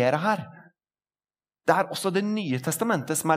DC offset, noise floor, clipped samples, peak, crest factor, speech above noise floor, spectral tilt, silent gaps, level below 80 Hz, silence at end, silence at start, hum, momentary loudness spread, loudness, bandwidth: under 0.1%; under -90 dBFS; under 0.1%; -6 dBFS; 22 dB; over 65 dB; -4.5 dB/octave; none; -78 dBFS; 0 s; 0 s; none; 6 LU; -26 LUFS; 16 kHz